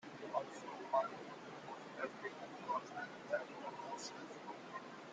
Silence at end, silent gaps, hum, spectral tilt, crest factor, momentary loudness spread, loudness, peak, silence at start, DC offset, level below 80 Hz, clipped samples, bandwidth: 0 s; none; none; -4 dB/octave; 22 dB; 12 LU; -46 LUFS; -24 dBFS; 0 s; under 0.1%; -90 dBFS; under 0.1%; 9.6 kHz